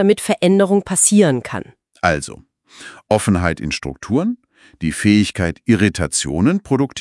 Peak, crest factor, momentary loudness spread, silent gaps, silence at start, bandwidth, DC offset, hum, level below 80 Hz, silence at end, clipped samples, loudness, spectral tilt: 0 dBFS; 16 dB; 12 LU; none; 0 s; 12 kHz; under 0.1%; none; -44 dBFS; 0 s; under 0.1%; -17 LUFS; -4.5 dB/octave